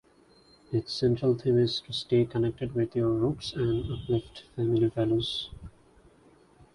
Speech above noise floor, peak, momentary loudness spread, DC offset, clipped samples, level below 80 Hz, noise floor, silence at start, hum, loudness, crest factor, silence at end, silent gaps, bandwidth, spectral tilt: 32 dB; -14 dBFS; 8 LU; under 0.1%; under 0.1%; -52 dBFS; -60 dBFS; 0.7 s; none; -28 LUFS; 16 dB; 1.05 s; none; 11 kHz; -7.5 dB/octave